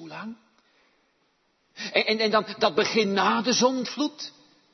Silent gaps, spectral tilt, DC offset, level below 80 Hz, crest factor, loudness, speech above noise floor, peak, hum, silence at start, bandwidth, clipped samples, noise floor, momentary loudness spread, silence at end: none; -3 dB/octave; under 0.1%; -72 dBFS; 20 dB; -24 LUFS; 45 dB; -8 dBFS; none; 0 s; 6.4 kHz; under 0.1%; -69 dBFS; 17 LU; 0.45 s